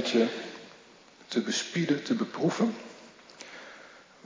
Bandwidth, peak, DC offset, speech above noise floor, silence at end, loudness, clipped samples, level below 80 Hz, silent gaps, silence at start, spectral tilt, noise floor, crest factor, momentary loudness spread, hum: 7.6 kHz; -12 dBFS; under 0.1%; 27 dB; 0.25 s; -29 LUFS; under 0.1%; -82 dBFS; none; 0 s; -4.5 dB/octave; -55 dBFS; 18 dB; 22 LU; none